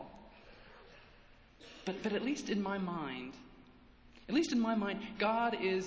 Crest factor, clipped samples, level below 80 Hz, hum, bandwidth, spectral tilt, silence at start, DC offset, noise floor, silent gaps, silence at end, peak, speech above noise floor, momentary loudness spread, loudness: 18 dB; under 0.1%; -66 dBFS; none; 8 kHz; -5 dB/octave; 0 s; under 0.1%; -61 dBFS; none; 0 s; -20 dBFS; 26 dB; 24 LU; -36 LUFS